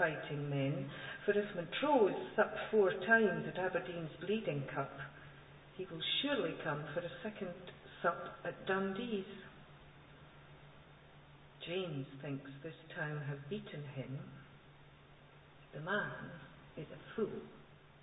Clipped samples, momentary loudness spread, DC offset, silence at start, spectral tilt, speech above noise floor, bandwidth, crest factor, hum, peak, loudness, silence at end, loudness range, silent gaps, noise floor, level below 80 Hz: under 0.1%; 23 LU; under 0.1%; 0 s; -2.5 dB/octave; 23 dB; 3.9 kHz; 22 dB; none; -18 dBFS; -38 LUFS; 0 s; 13 LU; none; -61 dBFS; -70 dBFS